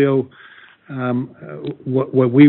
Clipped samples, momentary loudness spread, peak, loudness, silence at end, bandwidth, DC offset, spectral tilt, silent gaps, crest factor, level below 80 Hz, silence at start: under 0.1%; 16 LU; 0 dBFS; -21 LUFS; 0 s; 4.2 kHz; under 0.1%; -8 dB/octave; none; 16 dB; -64 dBFS; 0 s